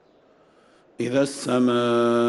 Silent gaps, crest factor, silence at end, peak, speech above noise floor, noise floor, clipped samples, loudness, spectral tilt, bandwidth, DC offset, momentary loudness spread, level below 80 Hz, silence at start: none; 14 dB; 0 s; -10 dBFS; 36 dB; -57 dBFS; under 0.1%; -22 LUFS; -5.5 dB/octave; 12 kHz; under 0.1%; 5 LU; -68 dBFS; 1 s